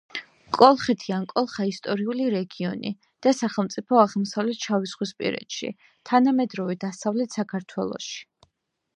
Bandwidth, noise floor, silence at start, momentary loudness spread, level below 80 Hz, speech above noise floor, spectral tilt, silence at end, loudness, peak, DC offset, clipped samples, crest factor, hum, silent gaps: 9.6 kHz; -78 dBFS; 0.15 s; 13 LU; -70 dBFS; 54 dB; -5.5 dB/octave; 0.75 s; -24 LUFS; -2 dBFS; under 0.1%; under 0.1%; 24 dB; none; none